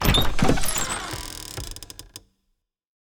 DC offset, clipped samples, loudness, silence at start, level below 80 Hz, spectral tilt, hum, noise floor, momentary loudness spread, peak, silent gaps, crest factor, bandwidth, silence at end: under 0.1%; under 0.1%; -25 LUFS; 0 s; -32 dBFS; -3.5 dB/octave; none; -75 dBFS; 20 LU; -4 dBFS; none; 20 dB; 19.5 kHz; 0.9 s